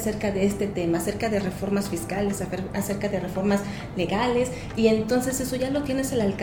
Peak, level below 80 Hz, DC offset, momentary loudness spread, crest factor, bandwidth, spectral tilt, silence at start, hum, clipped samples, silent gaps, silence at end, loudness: -8 dBFS; -44 dBFS; under 0.1%; 5 LU; 16 dB; 19.5 kHz; -5.5 dB/octave; 0 s; none; under 0.1%; none; 0 s; -26 LUFS